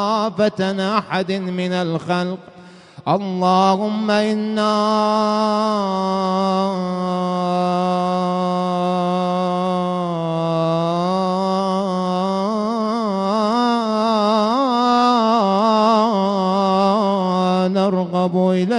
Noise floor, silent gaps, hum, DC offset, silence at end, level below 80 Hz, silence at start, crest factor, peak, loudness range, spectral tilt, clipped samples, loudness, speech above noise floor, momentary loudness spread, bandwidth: -41 dBFS; none; none; under 0.1%; 0 s; -60 dBFS; 0 s; 14 dB; -4 dBFS; 4 LU; -6.5 dB/octave; under 0.1%; -18 LUFS; 22 dB; 6 LU; 10.5 kHz